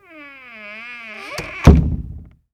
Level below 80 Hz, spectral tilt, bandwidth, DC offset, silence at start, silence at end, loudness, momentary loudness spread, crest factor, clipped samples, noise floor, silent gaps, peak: -22 dBFS; -7.5 dB/octave; 12.5 kHz; under 0.1%; 0.65 s; 0.35 s; -17 LUFS; 25 LU; 18 dB; 0.6%; -40 dBFS; none; 0 dBFS